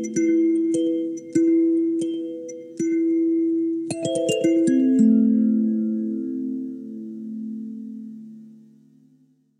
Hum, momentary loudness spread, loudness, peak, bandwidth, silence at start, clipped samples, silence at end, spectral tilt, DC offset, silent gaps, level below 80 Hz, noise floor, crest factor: none; 17 LU; -22 LUFS; -6 dBFS; 11 kHz; 0 s; under 0.1%; 1.05 s; -6 dB/octave; under 0.1%; none; -78 dBFS; -59 dBFS; 16 dB